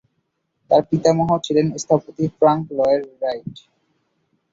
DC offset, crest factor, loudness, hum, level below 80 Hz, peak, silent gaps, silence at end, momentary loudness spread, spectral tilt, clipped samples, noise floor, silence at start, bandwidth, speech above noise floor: under 0.1%; 18 dB; -19 LUFS; none; -56 dBFS; -2 dBFS; none; 0.95 s; 9 LU; -6.5 dB/octave; under 0.1%; -72 dBFS; 0.7 s; 8 kHz; 53 dB